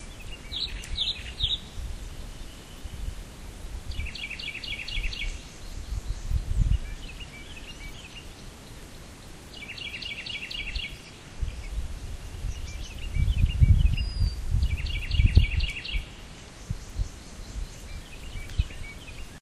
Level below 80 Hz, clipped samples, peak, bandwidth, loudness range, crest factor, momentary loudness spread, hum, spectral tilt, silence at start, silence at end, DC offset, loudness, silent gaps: -32 dBFS; under 0.1%; -6 dBFS; 13 kHz; 11 LU; 24 dB; 17 LU; none; -4.5 dB/octave; 0 s; 0 s; under 0.1%; -31 LUFS; none